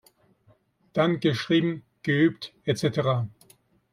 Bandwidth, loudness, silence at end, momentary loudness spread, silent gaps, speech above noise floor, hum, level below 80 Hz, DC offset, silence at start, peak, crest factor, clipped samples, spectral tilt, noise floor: 13.5 kHz; -25 LUFS; 0.65 s; 9 LU; none; 38 dB; none; -64 dBFS; under 0.1%; 0.95 s; -8 dBFS; 18 dB; under 0.1%; -6.5 dB/octave; -63 dBFS